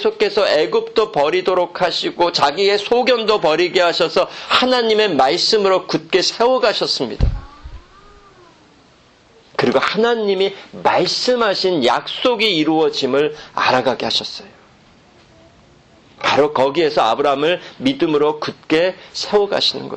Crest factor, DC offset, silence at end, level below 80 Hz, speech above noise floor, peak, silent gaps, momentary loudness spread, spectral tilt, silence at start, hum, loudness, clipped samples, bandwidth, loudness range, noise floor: 16 dB; under 0.1%; 0 s; -36 dBFS; 34 dB; 0 dBFS; none; 5 LU; -4 dB/octave; 0 s; none; -16 LUFS; under 0.1%; 8.8 kHz; 6 LU; -50 dBFS